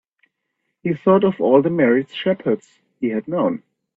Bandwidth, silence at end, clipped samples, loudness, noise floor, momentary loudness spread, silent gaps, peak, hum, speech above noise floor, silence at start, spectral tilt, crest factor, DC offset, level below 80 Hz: 7.8 kHz; 0.4 s; under 0.1%; -19 LUFS; -75 dBFS; 11 LU; none; -2 dBFS; none; 57 dB; 0.85 s; -8.5 dB/octave; 18 dB; under 0.1%; -64 dBFS